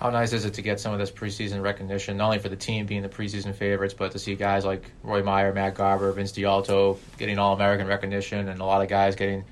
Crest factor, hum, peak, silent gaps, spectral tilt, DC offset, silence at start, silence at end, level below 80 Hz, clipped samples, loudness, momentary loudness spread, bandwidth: 16 dB; none; -10 dBFS; none; -5.5 dB/octave; under 0.1%; 0 s; 0.05 s; -52 dBFS; under 0.1%; -26 LUFS; 8 LU; 12.5 kHz